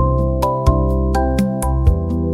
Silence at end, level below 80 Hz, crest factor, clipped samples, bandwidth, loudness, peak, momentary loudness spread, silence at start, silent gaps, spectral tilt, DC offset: 0 s; -20 dBFS; 14 dB; under 0.1%; 14.5 kHz; -17 LUFS; -2 dBFS; 2 LU; 0 s; none; -8 dB/octave; under 0.1%